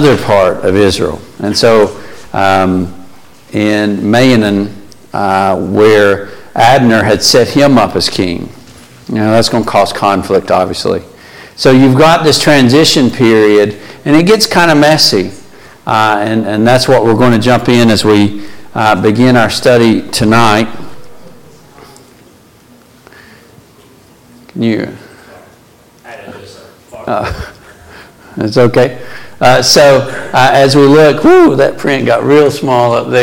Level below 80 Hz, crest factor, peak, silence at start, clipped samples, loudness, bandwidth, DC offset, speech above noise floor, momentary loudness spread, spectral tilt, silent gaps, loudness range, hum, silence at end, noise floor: -40 dBFS; 10 dB; 0 dBFS; 0 s; under 0.1%; -8 LUFS; 17.5 kHz; under 0.1%; 34 dB; 14 LU; -5 dB/octave; none; 15 LU; none; 0 s; -42 dBFS